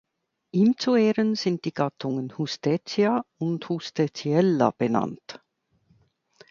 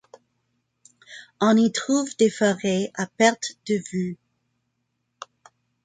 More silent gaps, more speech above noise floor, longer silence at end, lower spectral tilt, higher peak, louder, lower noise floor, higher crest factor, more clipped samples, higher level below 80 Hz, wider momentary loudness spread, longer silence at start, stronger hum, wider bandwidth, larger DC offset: neither; second, 42 dB vs 54 dB; second, 1.15 s vs 1.7 s; first, -6.5 dB/octave vs -4.5 dB/octave; about the same, -6 dBFS vs -4 dBFS; second, -25 LUFS vs -22 LUFS; second, -66 dBFS vs -76 dBFS; about the same, 18 dB vs 22 dB; neither; about the same, -70 dBFS vs -70 dBFS; second, 9 LU vs 24 LU; second, 0.55 s vs 1.1 s; neither; second, 7.4 kHz vs 9.4 kHz; neither